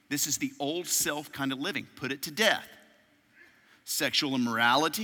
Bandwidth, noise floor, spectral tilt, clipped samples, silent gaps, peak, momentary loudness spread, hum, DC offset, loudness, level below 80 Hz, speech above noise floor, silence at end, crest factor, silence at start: 17 kHz; -63 dBFS; -2 dB/octave; under 0.1%; none; -8 dBFS; 10 LU; none; under 0.1%; -28 LUFS; -72 dBFS; 34 dB; 0 s; 22 dB; 0.1 s